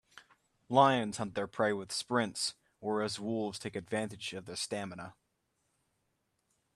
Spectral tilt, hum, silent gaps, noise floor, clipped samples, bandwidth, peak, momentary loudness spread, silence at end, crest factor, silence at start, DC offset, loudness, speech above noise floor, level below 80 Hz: -4 dB/octave; none; none; -80 dBFS; under 0.1%; 13 kHz; -10 dBFS; 14 LU; 1.65 s; 24 dB; 0.15 s; under 0.1%; -34 LUFS; 47 dB; -74 dBFS